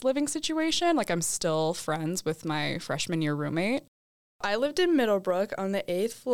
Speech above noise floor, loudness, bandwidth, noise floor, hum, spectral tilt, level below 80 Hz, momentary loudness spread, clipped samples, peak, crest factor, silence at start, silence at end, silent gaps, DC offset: over 62 dB; -28 LUFS; 19.5 kHz; under -90 dBFS; none; -4 dB/octave; -62 dBFS; 6 LU; under 0.1%; -16 dBFS; 12 dB; 0 s; 0 s; 3.88-4.39 s; 0.4%